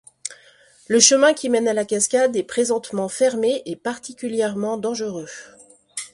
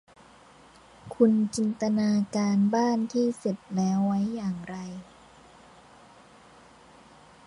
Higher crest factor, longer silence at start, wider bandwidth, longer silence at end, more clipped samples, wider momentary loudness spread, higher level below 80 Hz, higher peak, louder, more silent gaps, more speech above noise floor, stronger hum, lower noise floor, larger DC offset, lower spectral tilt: about the same, 22 dB vs 20 dB; second, 0.25 s vs 1.05 s; about the same, 11.5 kHz vs 11 kHz; second, 0.05 s vs 2.45 s; neither; first, 20 LU vs 15 LU; about the same, -66 dBFS vs -64 dBFS; first, 0 dBFS vs -10 dBFS; first, -20 LUFS vs -26 LUFS; neither; first, 32 dB vs 28 dB; neither; about the same, -52 dBFS vs -54 dBFS; neither; second, -2 dB/octave vs -6.5 dB/octave